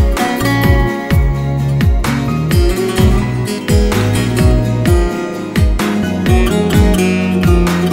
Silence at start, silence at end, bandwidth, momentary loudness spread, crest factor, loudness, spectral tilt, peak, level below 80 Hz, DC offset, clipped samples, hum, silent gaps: 0 s; 0 s; 16.5 kHz; 4 LU; 12 dB; -13 LUFS; -6.5 dB/octave; 0 dBFS; -18 dBFS; under 0.1%; under 0.1%; none; none